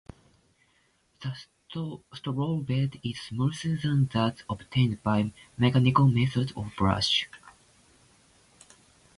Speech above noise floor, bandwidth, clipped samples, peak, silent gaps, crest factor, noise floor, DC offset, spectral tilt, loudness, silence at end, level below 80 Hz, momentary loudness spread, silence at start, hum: 41 dB; 11.5 kHz; under 0.1%; -8 dBFS; none; 20 dB; -68 dBFS; under 0.1%; -6.5 dB/octave; -27 LUFS; 1.65 s; -52 dBFS; 16 LU; 1.2 s; none